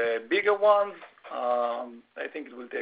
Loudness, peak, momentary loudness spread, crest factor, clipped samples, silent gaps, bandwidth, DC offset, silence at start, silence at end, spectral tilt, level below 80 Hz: -27 LUFS; -10 dBFS; 17 LU; 18 dB; under 0.1%; none; 4 kHz; under 0.1%; 0 s; 0 s; -6.5 dB/octave; -76 dBFS